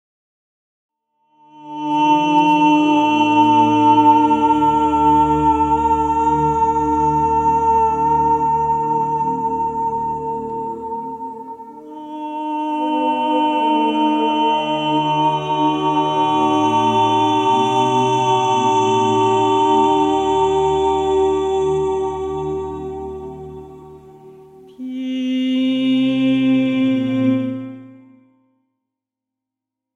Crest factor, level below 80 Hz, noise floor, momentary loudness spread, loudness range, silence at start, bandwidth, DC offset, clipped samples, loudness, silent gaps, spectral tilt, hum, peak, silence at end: 16 dB; -44 dBFS; -84 dBFS; 14 LU; 10 LU; 1.55 s; 9.2 kHz; under 0.1%; under 0.1%; -16 LUFS; none; -6 dB/octave; none; -2 dBFS; 2 s